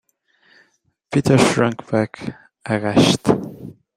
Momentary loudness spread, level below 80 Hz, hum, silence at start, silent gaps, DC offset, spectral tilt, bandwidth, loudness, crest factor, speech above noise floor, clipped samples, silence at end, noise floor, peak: 19 LU; -52 dBFS; none; 1.1 s; none; under 0.1%; -5.5 dB/octave; 14.5 kHz; -18 LUFS; 20 dB; 45 dB; under 0.1%; 0.25 s; -63 dBFS; 0 dBFS